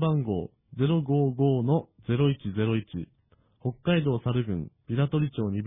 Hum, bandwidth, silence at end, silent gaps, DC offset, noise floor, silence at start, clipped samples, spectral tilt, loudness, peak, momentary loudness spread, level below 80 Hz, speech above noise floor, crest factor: none; 3.8 kHz; 0 s; none; under 0.1%; -64 dBFS; 0 s; under 0.1%; -12 dB/octave; -27 LUFS; -12 dBFS; 11 LU; -56 dBFS; 38 dB; 16 dB